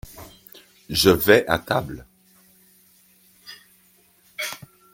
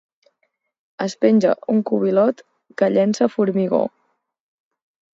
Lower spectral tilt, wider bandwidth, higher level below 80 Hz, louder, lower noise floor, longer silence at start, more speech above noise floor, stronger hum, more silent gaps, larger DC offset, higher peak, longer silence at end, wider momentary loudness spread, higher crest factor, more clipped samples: second, -4 dB/octave vs -7 dB/octave; first, 16.5 kHz vs 7.8 kHz; first, -50 dBFS vs -70 dBFS; about the same, -20 LUFS vs -19 LUFS; second, -58 dBFS vs -71 dBFS; second, 0.15 s vs 1 s; second, 39 dB vs 53 dB; neither; neither; neither; about the same, -2 dBFS vs -2 dBFS; second, 0.35 s vs 1.25 s; first, 26 LU vs 11 LU; first, 24 dB vs 18 dB; neither